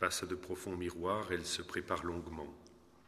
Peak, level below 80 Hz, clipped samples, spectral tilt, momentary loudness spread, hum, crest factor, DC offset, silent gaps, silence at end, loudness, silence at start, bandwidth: -16 dBFS; -60 dBFS; under 0.1%; -3.5 dB/octave; 11 LU; none; 24 dB; under 0.1%; none; 0.1 s; -39 LUFS; 0 s; 14 kHz